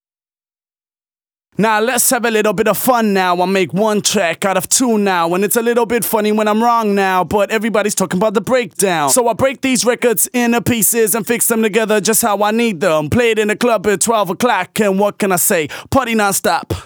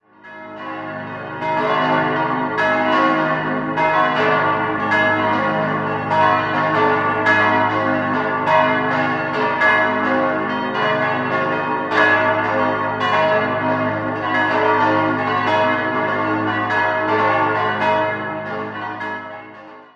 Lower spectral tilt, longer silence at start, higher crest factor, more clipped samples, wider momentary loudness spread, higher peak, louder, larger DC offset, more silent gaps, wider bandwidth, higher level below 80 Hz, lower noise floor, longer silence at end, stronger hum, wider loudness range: second, -3.5 dB/octave vs -6.5 dB/octave; first, 1.6 s vs 0.25 s; about the same, 14 dB vs 18 dB; neither; second, 3 LU vs 10 LU; about the same, 0 dBFS vs -2 dBFS; first, -14 LUFS vs -17 LUFS; neither; neither; first, over 20 kHz vs 8.2 kHz; first, -48 dBFS vs -56 dBFS; first, under -90 dBFS vs -39 dBFS; about the same, 0 s vs 0.1 s; neither; about the same, 1 LU vs 2 LU